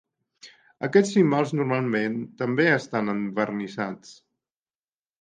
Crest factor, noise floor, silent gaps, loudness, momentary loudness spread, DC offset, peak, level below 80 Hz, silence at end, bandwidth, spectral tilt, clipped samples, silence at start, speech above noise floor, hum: 20 dB; under -90 dBFS; none; -24 LUFS; 11 LU; under 0.1%; -6 dBFS; -72 dBFS; 1.1 s; 9.6 kHz; -6.5 dB/octave; under 0.1%; 0.45 s; over 66 dB; none